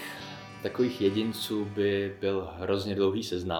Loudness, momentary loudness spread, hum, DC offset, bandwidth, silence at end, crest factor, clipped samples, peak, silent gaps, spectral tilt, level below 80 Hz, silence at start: -30 LUFS; 10 LU; none; under 0.1%; 18 kHz; 0 s; 16 dB; under 0.1%; -14 dBFS; none; -5.5 dB/octave; -64 dBFS; 0 s